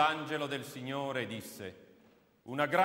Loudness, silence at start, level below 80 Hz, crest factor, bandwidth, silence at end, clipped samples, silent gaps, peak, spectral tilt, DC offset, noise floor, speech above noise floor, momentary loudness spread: -37 LUFS; 0 s; -80 dBFS; 20 dB; 16 kHz; 0 s; under 0.1%; none; -16 dBFS; -4.5 dB/octave; under 0.1%; -65 dBFS; 31 dB; 15 LU